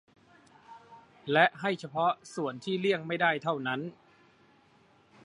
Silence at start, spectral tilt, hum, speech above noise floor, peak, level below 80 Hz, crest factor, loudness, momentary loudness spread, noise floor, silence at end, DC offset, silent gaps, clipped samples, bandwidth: 0.7 s; -5.5 dB/octave; none; 34 dB; -8 dBFS; -78 dBFS; 24 dB; -30 LUFS; 11 LU; -63 dBFS; 1.3 s; under 0.1%; none; under 0.1%; 11 kHz